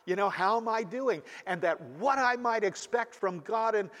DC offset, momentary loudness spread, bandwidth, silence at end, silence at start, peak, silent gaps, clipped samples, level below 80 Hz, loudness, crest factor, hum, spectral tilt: under 0.1%; 6 LU; 13 kHz; 0 s; 0.05 s; -14 dBFS; none; under 0.1%; -80 dBFS; -30 LUFS; 16 dB; none; -4.5 dB/octave